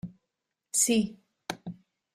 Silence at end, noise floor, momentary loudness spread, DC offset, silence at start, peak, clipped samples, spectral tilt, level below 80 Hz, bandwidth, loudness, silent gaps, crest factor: 0.4 s; -85 dBFS; 20 LU; under 0.1%; 0.05 s; -12 dBFS; under 0.1%; -3 dB/octave; -66 dBFS; 15.5 kHz; -27 LUFS; none; 22 dB